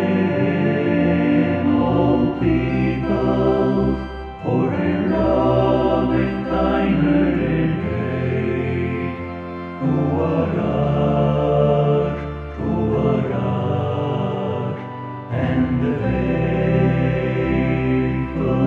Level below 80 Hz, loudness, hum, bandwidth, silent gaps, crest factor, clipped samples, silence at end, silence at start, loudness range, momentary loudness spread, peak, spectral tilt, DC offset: -34 dBFS; -19 LUFS; none; 6.6 kHz; none; 14 dB; under 0.1%; 0 s; 0 s; 4 LU; 8 LU; -4 dBFS; -9.5 dB/octave; under 0.1%